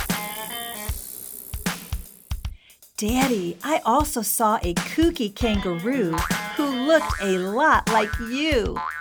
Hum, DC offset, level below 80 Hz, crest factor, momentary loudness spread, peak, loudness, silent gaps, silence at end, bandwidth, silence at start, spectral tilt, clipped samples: none; under 0.1%; -36 dBFS; 18 dB; 14 LU; -6 dBFS; -23 LUFS; none; 0 s; over 20 kHz; 0 s; -4 dB/octave; under 0.1%